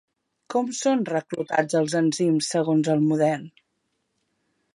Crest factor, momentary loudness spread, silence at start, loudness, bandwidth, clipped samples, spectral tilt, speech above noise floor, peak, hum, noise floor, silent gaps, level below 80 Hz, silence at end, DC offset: 18 dB; 6 LU; 0.5 s; -23 LUFS; 11.5 kHz; under 0.1%; -5.5 dB/octave; 52 dB; -8 dBFS; none; -75 dBFS; none; -74 dBFS; 1.25 s; under 0.1%